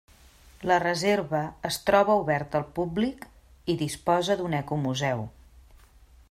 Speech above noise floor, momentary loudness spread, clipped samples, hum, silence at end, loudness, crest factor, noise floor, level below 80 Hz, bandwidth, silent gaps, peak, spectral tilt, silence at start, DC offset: 29 dB; 9 LU; under 0.1%; none; 1 s; -27 LUFS; 20 dB; -55 dBFS; -54 dBFS; 16 kHz; none; -8 dBFS; -5 dB/octave; 0.6 s; under 0.1%